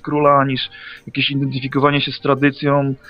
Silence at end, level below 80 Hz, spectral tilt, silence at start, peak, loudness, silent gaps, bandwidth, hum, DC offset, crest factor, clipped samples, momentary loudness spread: 0.15 s; -52 dBFS; -8.5 dB/octave; 0.05 s; 0 dBFS; -17 LUFS; none; 5.4 kHz; none; under 0.1%; 18 dB; under 0.1%; 11 LU